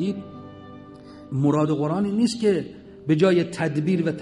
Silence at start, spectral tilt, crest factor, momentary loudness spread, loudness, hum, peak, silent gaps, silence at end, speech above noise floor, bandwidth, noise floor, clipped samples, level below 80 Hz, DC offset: 0 s; -7 dB/octave; 18 dB; 23 LU; -22 LUFS; none; -6 dBFS; none; 0 s; 21 dB; 11.5 kHz; -43 dBFS; under 0.1%; -58 dBFS; under 0.1%